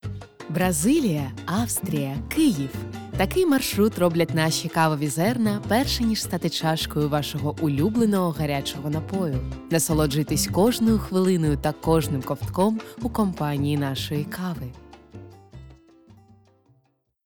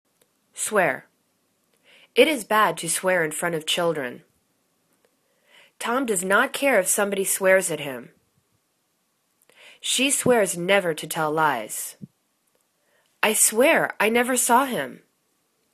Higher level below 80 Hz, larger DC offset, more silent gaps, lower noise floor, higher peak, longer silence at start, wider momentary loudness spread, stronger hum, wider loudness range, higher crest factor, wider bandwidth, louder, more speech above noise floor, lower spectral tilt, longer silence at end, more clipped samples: first, -42 dBFS vs -70 dBFS; neither; neither; second, -67 dBFS vs -71 dBFS; second, -6 dBFS vs -2 dBFS; second, 0.05 s vs 0.55 s; second, 8 LU vs 12 LU; neither; about the same, 6 LU vs 4 LU; about the same, 18 dB vs 22 dB; first, 19.5 kHz vs 14 kHz; about the same, -23 LUFS vs -21 LUFS; second, 44 dB vs 49 dB; first, -5 dB/octave vs -2 dB/octave; first, 1.5 s vs 0.8 s; neither